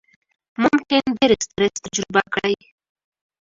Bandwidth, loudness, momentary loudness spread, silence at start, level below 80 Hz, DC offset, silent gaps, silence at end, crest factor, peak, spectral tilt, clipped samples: 7.8 kHz; -20 LUFS; 8 LU; 0.6 s; -54 dBFS; under 0.1%; none; 0.85 s; 22 dB; 0 dBFS; -3.5 dB/octave; under 0.1%